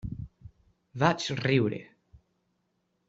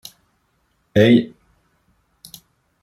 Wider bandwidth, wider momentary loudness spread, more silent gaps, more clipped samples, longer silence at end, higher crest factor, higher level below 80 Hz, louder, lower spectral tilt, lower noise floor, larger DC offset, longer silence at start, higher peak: second, 8 kHz vs 15 kHz; second, 19 LU vs 28 LU; neither; neither; second, 0.9 s vs 1.55 s; about the same, 24 dB vs 20 dB; about the same, -56 dBFS vs -56 dBFS; second, -28 LUFS vs -16 LUFS; about the same, -6 dB/octave vs -7 dB/octave; first, -76 dBFS vs -66 dBFS; neither; second, 0.05 s vs 0.95 s; second, -8 dBFS vs -2 dBFS